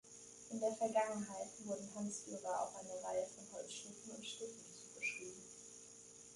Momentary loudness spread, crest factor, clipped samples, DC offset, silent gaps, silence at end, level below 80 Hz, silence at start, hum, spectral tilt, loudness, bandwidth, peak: 16 LU; 20 dB; under 0.1%; under 0.1%; none; 0 s; -82 dBFS; 0.05 s; none; -3 dB/octave; -45 LUFS; 11.5 kHz; -24 dBFS